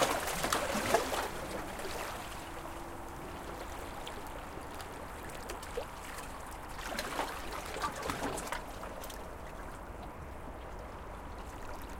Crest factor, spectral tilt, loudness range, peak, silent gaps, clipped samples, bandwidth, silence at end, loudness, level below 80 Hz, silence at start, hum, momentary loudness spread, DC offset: 28 dB; -3 dB/octave; 7 LU; -12 dBFS; none; under 0.1%; 17 kHz; 0 s; -39 LUFS; -50 dBFS; 0 s; none; 14 LU; under 0.1%